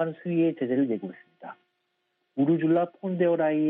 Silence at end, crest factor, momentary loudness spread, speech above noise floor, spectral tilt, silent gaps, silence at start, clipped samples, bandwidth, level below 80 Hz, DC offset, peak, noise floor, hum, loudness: 0 s; 14 dB; 22 LU; 51 dB; -7.5 dB/octave; none; 0 s; under 0.1%; 3.8 kHz; -78 dBFS; under 0.1%; -12 dBFS; -77 dBFS; none; -26 LUFS